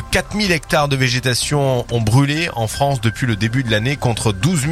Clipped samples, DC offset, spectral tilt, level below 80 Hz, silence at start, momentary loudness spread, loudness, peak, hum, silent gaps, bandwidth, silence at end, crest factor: under 0.1%; under 0.1%; -5 dB/octave; -36 dBFS; 0 s; 4 LU; -17 LUFS; 0 dBFS; none; none; 14.5 kHz; 0 s; 16 dB